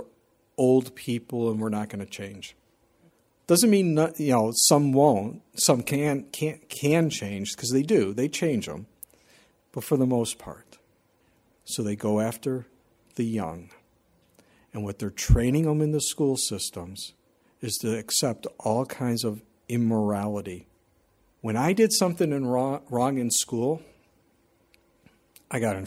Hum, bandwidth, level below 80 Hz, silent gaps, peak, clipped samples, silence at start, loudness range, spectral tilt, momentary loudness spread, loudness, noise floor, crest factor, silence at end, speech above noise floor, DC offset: none; 16.5 kHz; -42 dBFS; none; -4 dBFS; under 0.1%; 0 s; 9 LU; -4.5 dB/octave; 17 LU; -25 LUFS; -65 dBFS; 22 dB; 0 s; 40 dB; under 0.1%